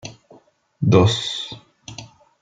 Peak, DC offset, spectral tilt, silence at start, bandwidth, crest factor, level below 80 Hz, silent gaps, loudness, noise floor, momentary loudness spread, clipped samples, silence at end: -2 dBFS; under 0.1%; -6 dB/octave; 0.05 s; 9.2 kHz; 20 dB; -52 dBFS; none; -19 LUFS; -52 dBFS; 23 LU; under 0.1%; 0.35 s